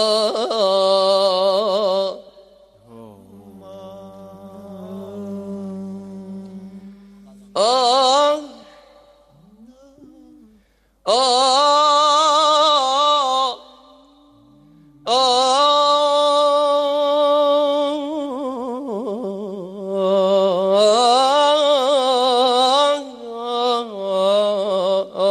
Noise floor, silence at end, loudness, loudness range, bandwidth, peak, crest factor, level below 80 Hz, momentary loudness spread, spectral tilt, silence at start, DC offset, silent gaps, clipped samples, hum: -58 dBFS; 0 s; -16 LUFS; 18 LU; 12.5 kHz; -4 dBFS; 16 dB; -64 dBFS; 19 LU; -3 dB/octave; 0 s; under 0.1%; none; under 0.1%; none